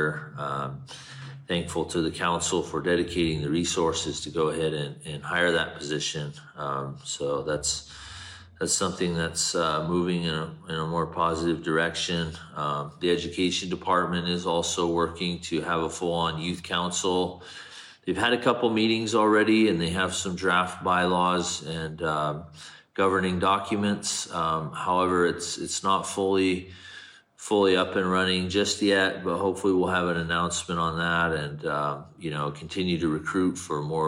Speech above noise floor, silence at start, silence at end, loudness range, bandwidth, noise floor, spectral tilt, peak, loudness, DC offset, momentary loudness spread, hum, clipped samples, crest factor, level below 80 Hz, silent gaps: 21 dB; 0 s; 0 s; 4 LU; 15.5 kHz; -48 dBFS; -4 dB/octave; -10 dBFS; -26 LUFS; under 0.1%; 11 LU; none; under 0.1%; 18 dB; -54 dBFS; none